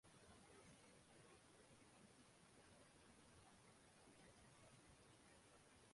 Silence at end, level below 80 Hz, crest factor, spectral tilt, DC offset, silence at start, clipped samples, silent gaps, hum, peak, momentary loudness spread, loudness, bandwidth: 0 s; -84 dBFS; 14 dB; -3.5 dB/octave; under 0.1%; 0.05 s; under 0.1%; none; none; -56 dBFS; 2 LU; -69 LUFS; 11.5 kHz